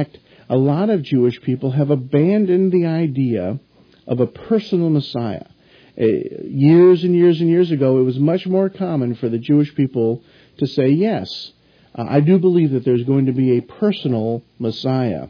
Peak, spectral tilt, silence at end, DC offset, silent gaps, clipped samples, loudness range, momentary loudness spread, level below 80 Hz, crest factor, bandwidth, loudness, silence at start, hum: -2 dBFS; -10 dB/octave; 0 s; under 0.1%; none; under 0.1%; 5 LU; 11 LU; -60 dBFS; 14 dB; 5.4 kHz; -17 LUFS; 0 s; none